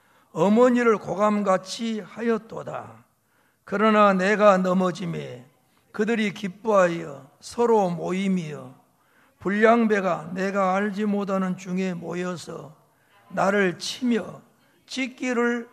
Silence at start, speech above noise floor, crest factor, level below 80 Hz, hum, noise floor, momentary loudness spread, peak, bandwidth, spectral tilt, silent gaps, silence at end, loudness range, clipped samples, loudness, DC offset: 0.35 s; 43 dB; 20 dB; -70 dBFS; none; -65 dBFS; 17 LU; -4 dBFS; 13.5 kHz; -6 dB/octave; none; 0.05 s; 5 LU; under 0.1%; -23 LUFS; under 0.1%